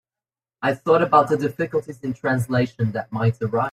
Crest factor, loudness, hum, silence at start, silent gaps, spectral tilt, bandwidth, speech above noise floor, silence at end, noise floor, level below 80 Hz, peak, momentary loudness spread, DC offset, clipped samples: 20 dB; -21 LUFS; none; 0.6 s; none; -7.5 dB/octave; 14 kHz; over 69 dB; 0 s; under -90 dBFS; -60 dBFS; -2 dBFS; 9 LU; under 0.1%; under 0.1%